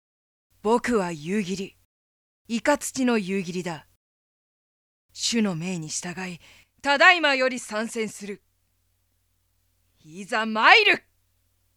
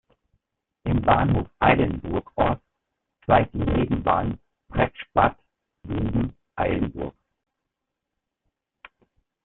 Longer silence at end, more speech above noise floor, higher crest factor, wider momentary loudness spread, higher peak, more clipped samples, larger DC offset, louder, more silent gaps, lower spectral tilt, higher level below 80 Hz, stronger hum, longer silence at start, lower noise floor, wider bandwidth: second, 0.8 s vs 2.35 s; second, 47 dB vs 61 dB; about the same, 26 dB vs 22 dB; first, 20 LU vs 13 LU; first, 0 dBFS vs -4 dBFS; neither; neither; about the same, -22 LUFS vs -24 LUFS; first, 1.85-2.45 s, 3.96-5.09 s vs none; second, -3 dB/octave vs -11.5 dB/octave; second, -64 dBFS vs -40 dBFS; neither; second, 0.65 s vs 0.85 s; second, -70 dBFS vs -83 dBFS; first, 16.5 kHz vs 4.2 kHz